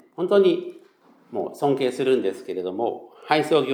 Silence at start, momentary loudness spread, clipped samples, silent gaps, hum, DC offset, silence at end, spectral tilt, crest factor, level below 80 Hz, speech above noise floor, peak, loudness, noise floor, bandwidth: 0.2 s; 12 LU; under 0.1%; none; none; under 0.1%; 0 s; -6 dB/octave; 20 dB; -84 dBFS; 33 dB; -2 dBFS; -23 LUFS; -55 dBFS; 14.5 kHz